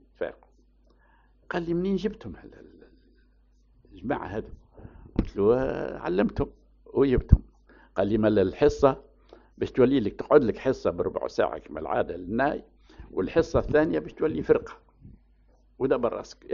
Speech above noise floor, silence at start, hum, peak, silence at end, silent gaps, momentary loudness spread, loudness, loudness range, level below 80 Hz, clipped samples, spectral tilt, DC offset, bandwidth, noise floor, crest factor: 36 dB; 0.2 s; none; 0 dBFS; 0 s; none; 14 LU; -26 LUFS; 10 LU; -38 dBFS; under 0.1%; -7 dB/octave; under 0.1%; 7.2 kHz; -61 dBFS; 28 dB